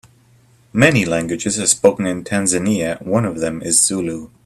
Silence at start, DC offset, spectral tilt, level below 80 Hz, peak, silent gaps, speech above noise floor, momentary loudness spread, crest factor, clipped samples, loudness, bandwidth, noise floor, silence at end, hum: 0.75 s; under 0.1%; -4 dB/octave; -50 dBFS; 0 dBFS; none; 35 dB; 9 LU; 18 dB; under 0.1%; -16 LUFS; 14.5 kHz; -52 dBFS; 0.2 s; none